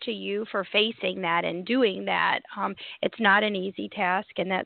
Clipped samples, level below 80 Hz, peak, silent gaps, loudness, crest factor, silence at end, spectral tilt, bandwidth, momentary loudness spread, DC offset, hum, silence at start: under 0.1%; -72 dBFS; -6 dBFS; none; -26 LUFS; 20 dB; 0 s; -8.5 dB/octave; 4.7 kHz; 10 LU; under 0.1%; none; 0 s